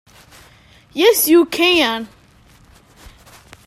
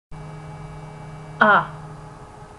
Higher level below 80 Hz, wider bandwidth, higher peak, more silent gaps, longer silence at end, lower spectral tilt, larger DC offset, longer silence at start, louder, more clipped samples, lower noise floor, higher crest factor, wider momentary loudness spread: about the same, -52 dBFS vs -48 dBFS; first, 15 kHz vs 11.5 kHz; about the same, 0 dBFS vs 0 dBFS; neither; first, 1.6 s vs 0.35 s; second, -2 dB/octave vs -6 dB/octave; neither; first, 0.95 s vs 0.1 s; first, -14 LUFS vs -18 LUFS; neither; first, -49 dBFS vs -41 dBFS; second, 18 dB vs 24 dB; second, 17 LU vs 24 LU